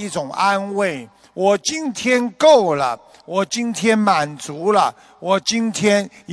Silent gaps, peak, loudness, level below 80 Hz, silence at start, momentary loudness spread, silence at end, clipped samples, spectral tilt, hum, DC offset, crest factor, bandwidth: none; -2 dBFS; -18 LUFS; -62 dBFS; 0 s; 11 LU; 0 s; under 0.1%; -4 dB/octave; none; under 0.1%; 16 dB; 11 kHz